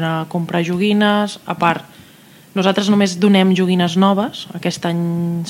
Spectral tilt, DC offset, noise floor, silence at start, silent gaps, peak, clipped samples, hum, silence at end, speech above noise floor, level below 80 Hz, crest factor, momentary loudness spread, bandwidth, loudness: -6 dB/octave; under 0.1%; -44 dBFS; 0 s; none; 0 dBFS; under 0.1%; none; 0 s; 28 dB; -62 dBFS; 16 dB; 10 LU; 15.5 kHz; -16 LUFS